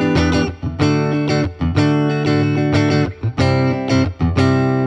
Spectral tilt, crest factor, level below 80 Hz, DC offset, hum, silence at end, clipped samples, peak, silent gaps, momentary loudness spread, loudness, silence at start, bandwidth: -7 dB/octave; 14 dB; -34 dBFS; under 0.1%; none; 0 s; under 0.1%; -2 dBFS; none; 4 LU; -17 LUFS; 0 s; 9.8 kHz